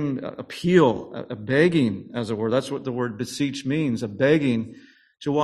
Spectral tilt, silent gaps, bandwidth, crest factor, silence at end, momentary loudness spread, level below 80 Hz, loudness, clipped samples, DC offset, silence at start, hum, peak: -6.5 dB/octave; none; 13 kHz; 20 dB; 0 s; 13 LU; -58 dBFS; -23 LUFS; under 0.1%; under 0.1%; 0 s; none; -4 dBFS